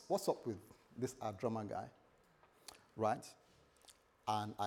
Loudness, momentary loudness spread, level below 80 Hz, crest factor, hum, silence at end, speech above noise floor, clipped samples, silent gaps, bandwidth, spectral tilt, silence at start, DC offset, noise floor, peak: -42 LUFS; 19 LU; -80 dBFS; 22 dB; none; 0 s; 29 dB; under 0.1%; none; 19.5 kHz; -5.5 dB/octave; 0 s; under 0.1%; -70 dBFS; -22 dBFS